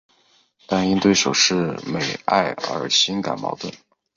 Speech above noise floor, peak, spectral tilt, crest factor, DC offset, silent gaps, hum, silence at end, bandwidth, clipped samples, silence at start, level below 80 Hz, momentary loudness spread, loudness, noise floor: 39 dB; -2 dBFS; -3 dB/octave; 18 dB; under 0.1%; none; none; 0.4 s; 7.6 kHz; under 0.1%; 0.7 s; -56 dBFS; 10 LU; -20 LUFS; -60 dBFS